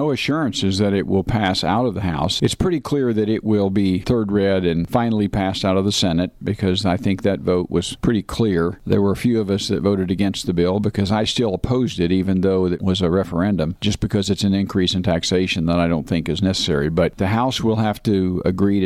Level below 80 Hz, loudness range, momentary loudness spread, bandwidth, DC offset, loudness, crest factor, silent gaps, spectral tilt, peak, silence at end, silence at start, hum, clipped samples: -40 dBFS; 1 LU; 2 LU; 14 kHz; under 0.1%; -19 LUFS; 12 dB; none; -6 dB/octave; -6 dBFS; 0 s; 0 s; none; under 0.1%